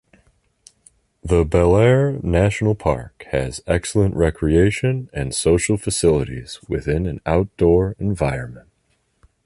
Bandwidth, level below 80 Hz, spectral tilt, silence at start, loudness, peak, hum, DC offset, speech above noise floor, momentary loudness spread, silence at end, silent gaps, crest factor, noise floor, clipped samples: 11.5 kHz; -32 dBFS; -6 dB/octave; 1.25 s; -19 LUFS; -2 dBFS; none; under 0.1%; 47 dB; 10 LU; 0.85 s; none; 18 dB; -66 dBFS; under 0.1%